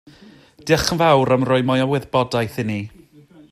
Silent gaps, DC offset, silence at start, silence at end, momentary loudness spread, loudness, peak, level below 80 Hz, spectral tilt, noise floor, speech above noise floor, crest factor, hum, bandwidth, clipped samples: none; under 0.1%; 0.65 s; 0.65 s; 12 LU; -18 LUFS; -2 dBFS; -46 dBFS; -5.5 dB/octave; -48 dBFS; 30 dB; 18 dB; none; 15 kHz; under 0.1%